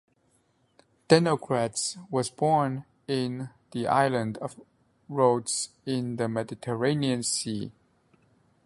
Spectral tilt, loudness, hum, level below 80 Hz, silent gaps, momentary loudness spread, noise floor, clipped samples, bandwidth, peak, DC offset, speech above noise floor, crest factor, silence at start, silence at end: -4.5 dB/octave; -27 LUFS; none; -66 dBFS; none; 13 LU; -68 dBFS; under 0.1%; 11.5 kHz; -4 dBFS; under 0.1%; 42 dB; 24 dB; 1.1 s; 0.95 s